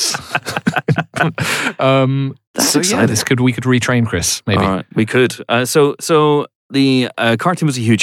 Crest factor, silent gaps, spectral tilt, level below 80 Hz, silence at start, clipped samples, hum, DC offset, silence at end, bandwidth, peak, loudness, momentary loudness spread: 14 dB; 2.47-2.54 s, 6.55-6.69 s; -4.5 dB/octave; -48 dBFS; 0 s; under 0.1%; none; under 0.1%; 0 s; 17 kHz; -2 dBFS; -15 LUFS; 5 LU